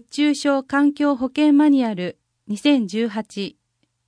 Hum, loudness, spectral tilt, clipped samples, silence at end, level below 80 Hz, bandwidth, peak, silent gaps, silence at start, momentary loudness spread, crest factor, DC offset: none; -19 LUFS; -5 dB/octave; under 0.1%; 0.6 s; -66 dBFS; 10.5 kHz; -6 dBFS; none; 0.15 s; 15 LU; 14 dB; under 0.1%